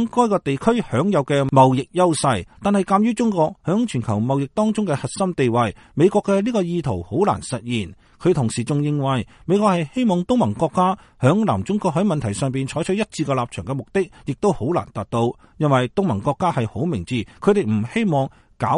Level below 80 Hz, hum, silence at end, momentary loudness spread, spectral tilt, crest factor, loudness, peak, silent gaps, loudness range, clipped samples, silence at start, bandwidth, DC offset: -50 dBFS; none; 0 s; 7 LU; -6.5 dB/octave; 18 dB; -20 LUFS; -2 dBFS; none; 4 LU; under 0.1%; 0 s; 11.5 kHz; under 0.1%